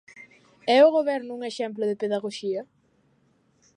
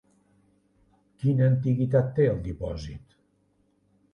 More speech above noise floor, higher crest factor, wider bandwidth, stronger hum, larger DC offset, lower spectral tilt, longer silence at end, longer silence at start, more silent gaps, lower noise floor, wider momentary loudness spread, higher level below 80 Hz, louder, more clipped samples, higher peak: about the same, 42 dB vs 44 dB; about the same, 20 dB vs 18 dB; first, 10.5 kHz vs 6.8 kHz; neither; neither; second, -4.5 dB/octave vs -9.5 dB/octave; about the same, 1.15 s vs 1.15 s; second, 0.15 s vs 1.2 s; neither; about the same, -65 dBFS vs -68 dBFS; about the same, 15 LU vs 15 LU; second, -80 dBFS vs -48 dBFS; about the same, -24 LUFS vs -25 LUFS; neither; about the same, -6 dBFS vs -8 dBFS